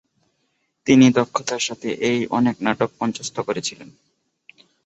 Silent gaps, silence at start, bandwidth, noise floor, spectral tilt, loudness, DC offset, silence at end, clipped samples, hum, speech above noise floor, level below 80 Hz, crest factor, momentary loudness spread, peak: none; 0.85 s; 8.2 kHz; -70 dBFS; -4.5 dB/octave; -20 LUFS; under 0.1%; 1 s; under 0.1%; none; 51 dB; -60 dBFS; 20 dB; 12 LU; 0 dBFS